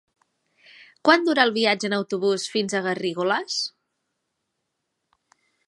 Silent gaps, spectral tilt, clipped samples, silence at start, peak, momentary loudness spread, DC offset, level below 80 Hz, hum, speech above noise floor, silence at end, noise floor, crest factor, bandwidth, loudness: none; -3.5 dB/octave; under 0.1%; 1.05 s; -2 dBFS; 8 LU; under 0.1%; -72 dBFS; none; 57 dB; 2 s; -79 dBFS; 24 dB; 11.5 kHz; -22 LUFS